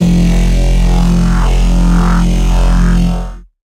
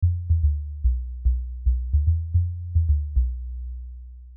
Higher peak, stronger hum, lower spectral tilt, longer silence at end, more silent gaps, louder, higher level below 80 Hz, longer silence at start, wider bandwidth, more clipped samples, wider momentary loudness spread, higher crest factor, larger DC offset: first, -2 dBFS vs -12 dBFS; neither; second, -6.5 dB/octave vs -19.5 dB/octave; first, 0.3 s vs 0 s; neither; first, -12 LUFS vs -25 LUFS; first, -10 dBFS vs -24 dBFS; about the same, 0 s vs 0 s; first, 11 kHz vs 0.4 kHz; neither; second, 3 LU vs 13 LU; about the same, 8 dB vs 12 dB; neither